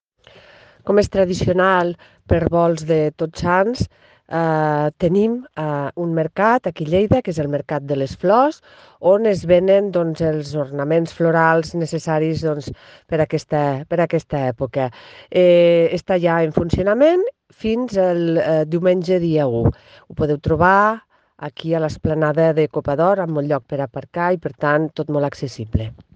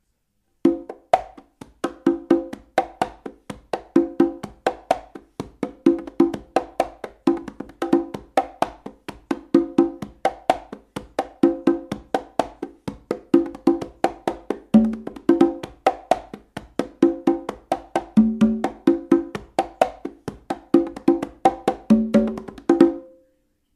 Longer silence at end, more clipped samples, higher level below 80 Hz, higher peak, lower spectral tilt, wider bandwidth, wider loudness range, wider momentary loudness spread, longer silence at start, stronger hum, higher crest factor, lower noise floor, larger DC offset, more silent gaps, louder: second, 0.25 s vs 0.75 s; neither; first, -44 dBFS vs -52 dBFS; about the same, 0 dBFS vs 0 dBFS; about the same, -7.5 dB/octave vs -7 dB/octave; second, 9.2 kHz vs 12.5 kHz; about the same, 3 LU vs 3 LU; second, 10 LU vs 14 LU; first, 0.85 s vs 0.65 s; neither; about the same, 18 dB vs 22 dB; second, -49 dBFS vs -71 dBFS; neither; neither; first, -18 LUFS vs -22 LUFS